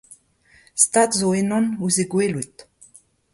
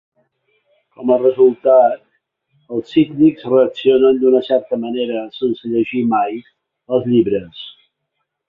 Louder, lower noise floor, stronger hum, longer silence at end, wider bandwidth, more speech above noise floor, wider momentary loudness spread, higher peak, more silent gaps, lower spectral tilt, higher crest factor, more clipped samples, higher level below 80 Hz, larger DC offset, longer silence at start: second, -19 LUFS vs -15 LUFS; second, -56 dBFS vs -74 dBFS; neither; about the same, 0.7 s vs 0.8 s; first, 12 kHz vs 4.8 kHz; second, 36 dB vs 59 dB; about the same, 14 LU vs 13 LU; about the same, -2 dBFS vs -2 dBFS; neither; second, -4 dB/octave vs -9 dB/octave; first, 22 dB vs 14 dB; neither; about the same, -62 dBFS vs -58 dBFS; neither; second, 0.1 s vs 1 s